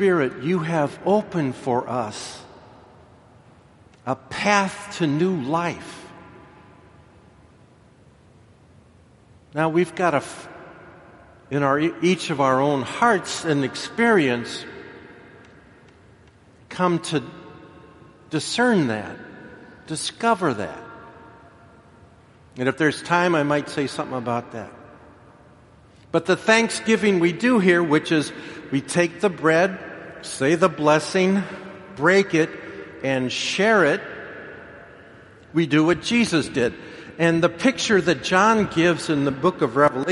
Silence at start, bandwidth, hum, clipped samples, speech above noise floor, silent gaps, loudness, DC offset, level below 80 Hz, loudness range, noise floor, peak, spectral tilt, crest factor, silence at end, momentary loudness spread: 0 s; 11.5 kHz; none; under 0.1%; 32 dB; none; -21 LUFS; under 0.1%; -60 dBFS; 8 LU; -52 dBFS; -2 dBFS; -5 dB/octave; 22 dB; 0 s; 19 LU